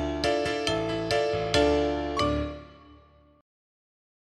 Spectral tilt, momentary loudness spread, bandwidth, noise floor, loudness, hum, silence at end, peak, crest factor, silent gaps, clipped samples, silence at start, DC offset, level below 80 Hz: -5 dB/octave; 7 LU; 13.5 kHz; -56 dBFS; -27 LUFS; none; 1.4 s; -6 dBFS; 22 dB; none; under 0.1%; 0 s; under 0.1%; -42 dBFS